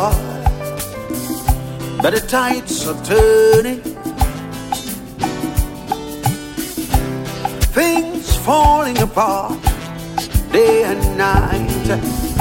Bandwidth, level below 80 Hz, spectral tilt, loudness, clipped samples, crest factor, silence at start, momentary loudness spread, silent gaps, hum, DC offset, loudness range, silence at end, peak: 17 kHz; -24 dBFS; -5 dB/octave; -17 LUFS; under 0.1%; 16 dB; 0 s; 12 LU; none; none; under 0.1%; 6 LU; 0 s; 0 dBFS